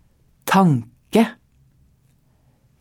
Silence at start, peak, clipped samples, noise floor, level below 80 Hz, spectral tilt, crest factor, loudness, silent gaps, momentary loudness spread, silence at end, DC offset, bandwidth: 0.45 s; -4 dBFS; under 0.1%; -59 dBFS; -60 dBFS; -6.5 dB/octave; 20 dB; -19 LUFS; none; 8 LU; 1.5 s; under 0.1%; 18 kHz